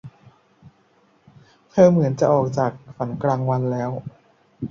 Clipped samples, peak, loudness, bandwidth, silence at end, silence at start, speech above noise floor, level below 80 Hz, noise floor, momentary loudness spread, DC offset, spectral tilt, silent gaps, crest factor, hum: under 0.1%; -2 dBFS; -20 LUFS; 7.4 kHz; 0.05 s; 0.05 s; 40 dB; -58 dBFS; -59 dBFS; 16 LU; under 0.1%; -8.5 dB/octave; none; 20 dB; none